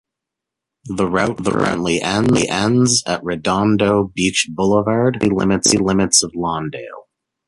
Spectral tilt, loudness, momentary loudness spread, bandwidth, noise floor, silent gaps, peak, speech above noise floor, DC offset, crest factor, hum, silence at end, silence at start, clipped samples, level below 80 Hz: -4 dB/octave; -16 LUFS; 8 LU; 11.5 kHz; -83 dBFS; none; 0 dBFS; 66 dB; under 0.1%; 18 dB; none; 0.45 s; 0.85 s; under 0.1%; -44 dBFS